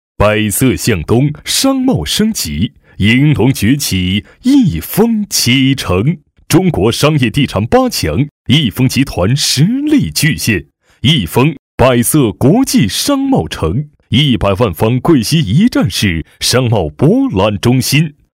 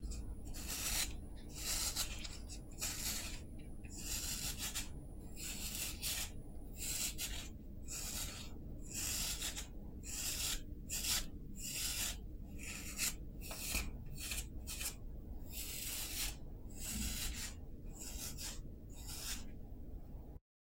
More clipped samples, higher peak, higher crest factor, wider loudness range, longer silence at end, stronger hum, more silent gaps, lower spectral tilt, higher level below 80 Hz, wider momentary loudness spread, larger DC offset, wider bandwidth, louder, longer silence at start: neither; first, 0 dBFS vs -24 dBFS; second, 12 dB vs 20 dB; second, 1 LU vs 4 LU; about the same, 0.25 s vs 0.25 s; neither; first, 8.31-8.45 s, 11.59-11.78 s vs none; first, -5 dB/octave vs -1.5 dB/octave; first, -32 dBFS vs -48 dBFS; second, 5 LU vs 15 LU; neither; about the same, 16.5 kHz vs 16 kHz; first, -12 LUFS vs -42 LUFS; first, 0.2 s vs 0 s